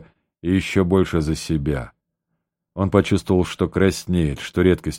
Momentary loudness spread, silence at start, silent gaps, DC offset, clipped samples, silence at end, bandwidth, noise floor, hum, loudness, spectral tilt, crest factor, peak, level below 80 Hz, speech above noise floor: 8 LU; 0 s; none; under 0.1%; under 0.1%; 0 s; 16 kHz; -77 dBFS; none; -20 LUFS; -6.5 dB/octave; 20 dB; -2 dBFS; -38 dBFS; 58 dB